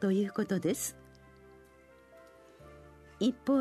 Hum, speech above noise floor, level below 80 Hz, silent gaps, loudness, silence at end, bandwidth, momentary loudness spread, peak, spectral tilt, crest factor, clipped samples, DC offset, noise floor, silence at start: none; 29 dB; -66 dBFS; none; -32 LUFS; 0 s; 13.5 kHz; 25 LU; -16 dBFS; -5.5 dB/octave; 18 dB; under 0.1%; under 0.1%; -59 dBFS; 0 s